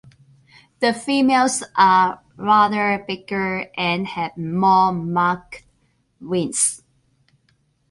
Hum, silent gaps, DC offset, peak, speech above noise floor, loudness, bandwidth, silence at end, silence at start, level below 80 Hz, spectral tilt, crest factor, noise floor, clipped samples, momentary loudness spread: none; none; under 0.1%; -4 dBFS; 45 dB; -19 LUFS; 11.5 kHz; 1.15 s; 0.8 s; -58 dBFS; -3.5 dB/octave; 18 dB; -64 dBFS; under 0.1%; 11 LU